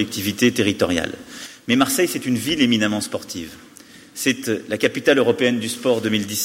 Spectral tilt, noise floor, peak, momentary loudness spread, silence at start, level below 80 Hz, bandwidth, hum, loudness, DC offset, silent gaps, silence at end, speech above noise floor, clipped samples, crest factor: -3.5 dB/octave; -45 dBFS; -4 dBFS; 15 LU; 0 s; -54 dBFS; 16.5 kHz; none; -20 LUFS; under 0.1%; none; 0 s; 25 dB; under 0.1%; 18 dB